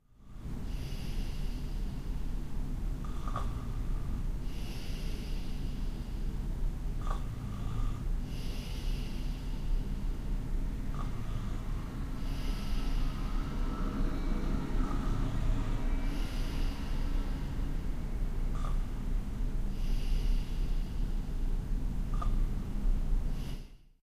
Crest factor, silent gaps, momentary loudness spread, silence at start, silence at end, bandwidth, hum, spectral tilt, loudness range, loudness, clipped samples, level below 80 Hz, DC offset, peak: 14 dB; none; 5 LU; 0.2 s; 0.2 s; 12 kHz; none; -6.5 dB/octave; 4 LU; -39 LUFS; under 0.1%; -34 dBFS; under 0.1%; -18 dBFS